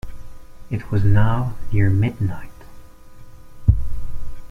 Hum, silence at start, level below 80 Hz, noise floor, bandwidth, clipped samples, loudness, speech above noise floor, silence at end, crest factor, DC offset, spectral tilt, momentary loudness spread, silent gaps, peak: none; 0.05 s; -30 dBFS; -38 dBFS; 4.6 kHz; under 0.1%; -21 LUFS; 22 dB; 0.05 s; 16 dB; under 0.1%; -9 dB/octave; 19 LU; none; -2 dBFS